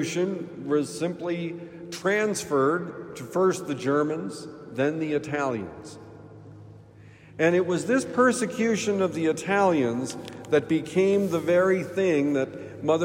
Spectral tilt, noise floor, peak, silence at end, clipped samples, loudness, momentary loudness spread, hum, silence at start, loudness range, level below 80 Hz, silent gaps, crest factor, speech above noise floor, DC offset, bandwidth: -5.5 dB/octave; -49 dBFS; -8 dBFS; 0 s; under 0.1%; -25 LUFS; 15 LU; none; 0 s; 5 LU; -66 dBFS; none; 18 dB; 24 dB; under 0.1%; 16 kHz